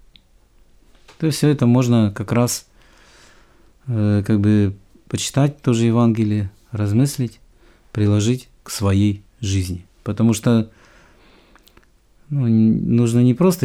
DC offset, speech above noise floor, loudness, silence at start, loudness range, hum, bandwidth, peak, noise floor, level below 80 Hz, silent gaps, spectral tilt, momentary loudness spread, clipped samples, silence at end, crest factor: under 0.1%; 36 dB; -19 LUFS; 1.2 s; 3 LU; none; 15.5 kHz; -4 dBFS; -53 dBFS; -50 dBFS; none; -6.5 dB/octave; 12 LU; under 0.1%; 0 s; 16 dB